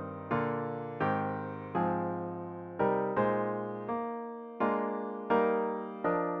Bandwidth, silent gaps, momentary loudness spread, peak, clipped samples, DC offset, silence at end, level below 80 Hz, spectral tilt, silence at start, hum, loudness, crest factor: 5.4 kHz; none; 9 LU; -16 dBFS; under 0.1%; under 0.1%; 0 s; -68 dBFS; -10 dB/octave; 0 s; none; -33 LUFS; 16 dB